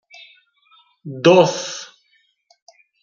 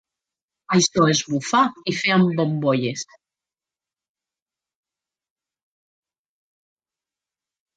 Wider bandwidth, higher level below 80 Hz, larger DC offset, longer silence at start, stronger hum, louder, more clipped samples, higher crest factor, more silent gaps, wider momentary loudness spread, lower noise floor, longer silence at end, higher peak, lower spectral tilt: second, 7.6 kHz vs 9.2 kHz; about the same, -68 dBFS vs -66 dBFS; neither; first, 1.05 s vs 0.7 s; neither; first, -16 LUFS vs -20 LUFS; neither; about the same, 20 dB vs 20 dB; neither; first, 26 LU vs 8 LU; second, -63 dBFS vs under -90 dBFS; second, 1.2 s vs 4.75 s; about the same, -2 dBFS vs -4 dBFS; about the same, -5 dB/octave vs -4.5 dB/octave